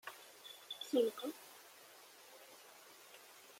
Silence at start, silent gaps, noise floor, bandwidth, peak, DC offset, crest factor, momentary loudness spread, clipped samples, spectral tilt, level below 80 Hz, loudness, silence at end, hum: 0.05 s; none; -61 dBFS; 16.5 kHz; -24 dBFS; under 0.1%; 22 dB; 22 LU; under 0.1%; -2.5 dB/octave; under -90 dBFS; -42 LUFS; 0 s; none